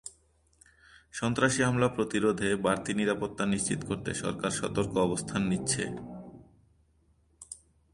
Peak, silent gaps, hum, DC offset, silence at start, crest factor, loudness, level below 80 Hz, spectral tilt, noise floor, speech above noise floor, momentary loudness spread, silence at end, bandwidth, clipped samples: -12 dBFS; none; none; under 0.1%; 0.05 s; 20 dB; -29 LUFS; -56 dBFS; -4.5 dB/octave; -67 dBFS; 38 dB; 19 LU; 0.4 s; 11.5 kHz; under 0.1%